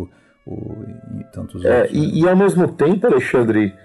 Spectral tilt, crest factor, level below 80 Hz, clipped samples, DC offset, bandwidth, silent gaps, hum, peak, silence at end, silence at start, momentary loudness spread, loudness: -7.5 dB/octave; 14 dB; -50 dBFS; under 0.1%; under 0.1%; 12 kHz; none; none; -4 dBFS; 0.15 s; 0 s; 19 LU; -16 LUFS